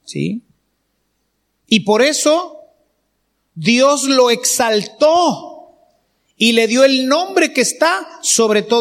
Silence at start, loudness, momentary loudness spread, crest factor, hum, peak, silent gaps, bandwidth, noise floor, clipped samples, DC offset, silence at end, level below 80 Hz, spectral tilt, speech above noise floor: 0.05 s; -14 LUFS; 9 LU; 16 dB; none; 0 dBFS; none; 16.5 kHz; -67 dBFS; under 0.1%; under 0.1%; 0 s; -66 dBFS; -2.5 dB/octave; 54 dB